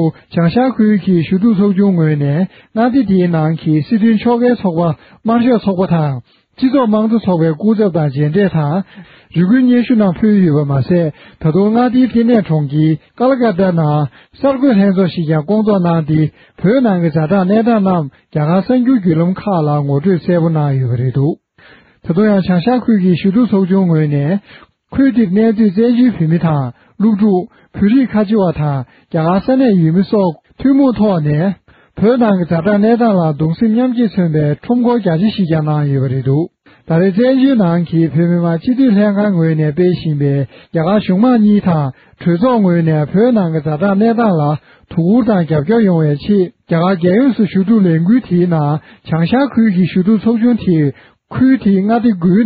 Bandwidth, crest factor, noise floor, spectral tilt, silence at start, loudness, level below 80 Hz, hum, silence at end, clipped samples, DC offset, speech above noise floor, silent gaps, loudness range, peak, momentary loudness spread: 4.9 kHz; 12 dB; -44 dBFS; -8 dB/octave; 0 s; -13 LUFS; -46 dBFS; none; 0 s; under 0.1%; under 0.1%; 33 dB; none; 1 LU; 0 dBFS; 7 LU